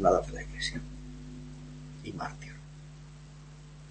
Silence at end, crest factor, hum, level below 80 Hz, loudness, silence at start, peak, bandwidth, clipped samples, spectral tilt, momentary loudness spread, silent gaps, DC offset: 0 s; 24 dB; none; -48 dBFS; -37 LUFS; 0 s; -10 dBFS; 8.4 kHz; under 0.1%; -5 dB/octave; 16 LU; none; under 0.1%